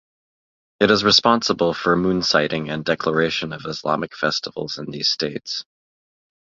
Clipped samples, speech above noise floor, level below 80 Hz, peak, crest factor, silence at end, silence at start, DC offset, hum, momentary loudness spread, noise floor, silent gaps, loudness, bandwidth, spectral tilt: under 0.1%; over 70 dB; -54 dBFS; -2 dBFS; 20 dB; 0.85 s; 0.8 s; under 0.1%; none; 14 LU; under -90 dBFS; none; -20 LUFS; 7.6 kHz; -4 dB/octave